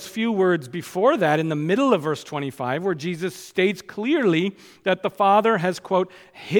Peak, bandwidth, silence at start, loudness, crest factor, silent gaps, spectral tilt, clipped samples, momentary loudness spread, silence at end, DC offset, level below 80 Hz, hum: -6 dBFS; 18.5 kHz; 0 s; -22 LUFS; 16 dB; none; -6 dB/octave; under 0.1%; 10 LU; 0 s; under 0.1%; -70 dBFS; none